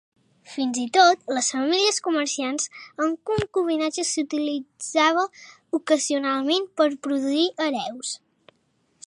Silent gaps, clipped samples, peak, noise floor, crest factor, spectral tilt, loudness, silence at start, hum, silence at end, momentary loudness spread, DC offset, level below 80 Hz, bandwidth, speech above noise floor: none; under 0.1%; -4 dBFS; -68 dBFS; 20 dB; -2.5 dB/octave; -23 LUFS; 0.5 s; none; 0.9 s; 10 LU; under 0.1%; -60 dBFS; 11.5 kHz; 45 dB